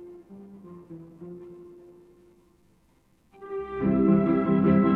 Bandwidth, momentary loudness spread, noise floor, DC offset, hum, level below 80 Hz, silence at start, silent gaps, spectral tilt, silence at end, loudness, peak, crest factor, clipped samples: 4.2 kHz; 25 LU; -63 dBFS; under 0.1%; none; -54 dBFS; 0 s; none; -11 dB/octave; 0 s; -24 LUFS; -10 dBFS; 18 dB; under 0.1%